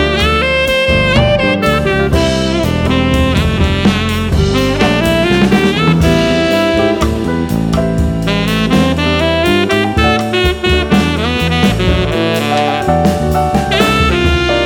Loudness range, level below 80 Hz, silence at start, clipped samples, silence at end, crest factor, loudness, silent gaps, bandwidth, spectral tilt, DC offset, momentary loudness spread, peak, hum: 1 LU; -22 dBFS; 0 s; under 0.1%; 0 s; 12 dB; -12 LUFS; none; 18.5 kHz; -5.5 dB/octave; under 0.1%; 4 LU; 0 dBFS; none